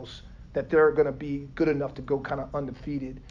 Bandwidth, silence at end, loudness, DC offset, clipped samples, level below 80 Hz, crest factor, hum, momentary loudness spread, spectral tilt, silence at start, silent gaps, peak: 7 kHz; 0 s; -27 LUFS; under 0.1%; under 0.1%; -48 dBFS; 16 dB; none; 13 LU; -8 dB/octave; 0 s; none; -10 dBFS